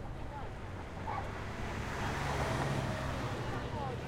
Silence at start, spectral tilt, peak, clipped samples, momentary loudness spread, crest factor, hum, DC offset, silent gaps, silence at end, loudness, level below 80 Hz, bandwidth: 0 s; -5.5 dB/octave; -22 dBFS; under 0.1%; 9 LU; 16 dB; none; under 0.1%; none; 0 s; -38 LUFS; -46 dBFS; 16.5 kHz